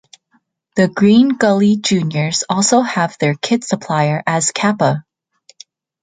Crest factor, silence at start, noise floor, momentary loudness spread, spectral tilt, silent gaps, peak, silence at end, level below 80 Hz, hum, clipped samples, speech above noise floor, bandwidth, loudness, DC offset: 14 dB; 0.75 s; -61 dBFS; 7 LU; -4.5 dB/octave; none; -2 dBFS; 1 s; -58 dBFS; none; under 0.1%; 47 dB; 9.6 kHz; -15 LUFS; under 0.1%